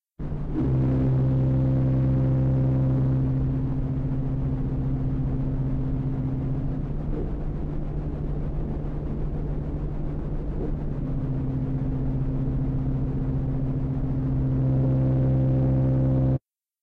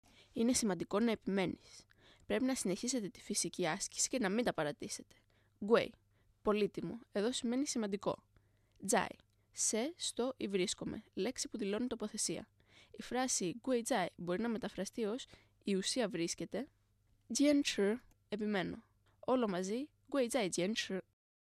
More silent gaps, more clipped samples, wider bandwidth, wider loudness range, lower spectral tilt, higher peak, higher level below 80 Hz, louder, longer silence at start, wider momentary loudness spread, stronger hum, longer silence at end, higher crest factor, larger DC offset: neither; neither; second, 3 kHz vs 13.5 kHz; first, 8 LU vs 2 LU; first, -12 dB/octave vs -3.5 dB/octave; about the same, -16 dBFS vs -16 dBFS; first, -32 dBFS vs -70 dBFS; first, -26 LUFS vs -37 LUFS; second, 0.2 s vs 0.35 s; about the same, 9 LU vs 11 LU; neither; about the same, 0.45 s vs 0.5 s; second, 8 dB vs 22 dB; neither